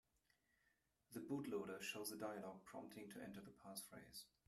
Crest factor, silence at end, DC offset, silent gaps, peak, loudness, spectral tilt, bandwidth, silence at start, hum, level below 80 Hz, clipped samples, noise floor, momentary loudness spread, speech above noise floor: 18 dB; 0.2 s; under 0.1%; none; -36 dBFS; -52 LUFS; -4 dB/octave; 15 kHz; 1.1 s; none; -86 dBFS; under 0.1%; -85 dBFS; 10 LU; 32 dB